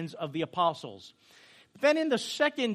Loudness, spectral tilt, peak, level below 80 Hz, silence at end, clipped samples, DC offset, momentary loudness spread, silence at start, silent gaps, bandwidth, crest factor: -29 LUFS; -4.5 dB/octave; -12 dBFS; -80 dBFS; 0 s; under 0.1%; under 0.1%; 16 LU; 0 s; none; 13 kHz; 20 dB